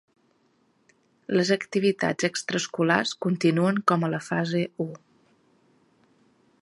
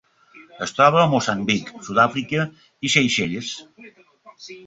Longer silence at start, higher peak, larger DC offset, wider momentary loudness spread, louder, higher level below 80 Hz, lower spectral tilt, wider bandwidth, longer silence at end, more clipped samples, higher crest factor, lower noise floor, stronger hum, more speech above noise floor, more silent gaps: first, 1.3 s vs 0.35 s; about the same, -4 dBFS vs -2 dBFS; neither; second, 6 LU vs 15 LU; second, -25 LUFS vs -20 LUFS; second, -70 dBFS vs -60 dBFS; about the same, -5 dB/octave vs -4 dB/octave; first, 11.5 kHz vs 8.2 kHz; first, 1.65 s vs 0.05 s; neither; about the same, 22 dB vs 20 dB; first, -66 dBFS vs -50 dBFS; neither; first, 42 dB vs 29 dB; neither